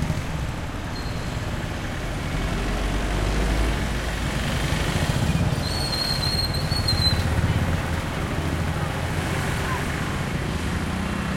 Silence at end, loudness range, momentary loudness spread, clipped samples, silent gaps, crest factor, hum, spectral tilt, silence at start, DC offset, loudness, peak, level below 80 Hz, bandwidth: 0 s; 4 LU; 7 LU; under 0.1%; none; 16 dB; none; -5 dB/octave; 0 s; under 0.1%; -25 LUFS; -8 dBFS; -30 dBFS; 16.5 kHz